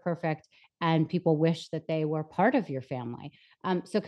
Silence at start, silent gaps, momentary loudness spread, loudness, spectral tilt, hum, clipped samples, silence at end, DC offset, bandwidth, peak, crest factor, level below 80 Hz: 0.05 s; none; 12 LU; -29 LUFS; -7.5 dB/octave; none; under 0.1%; 0 s; under 0.1%; 9.6 kHz; -12 dBFS; 18 dB; -76 dBFS